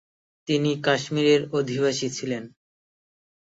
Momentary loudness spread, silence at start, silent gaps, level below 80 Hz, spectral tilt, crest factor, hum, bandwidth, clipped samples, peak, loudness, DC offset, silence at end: 11 LU; 0.45 s; none; -66 dBFS; -5 dB/octave; 20 dB; none; 8 kHz; under 0.1%; -6 dBFS; -24 LUFS; under 0.1%; 1.1 s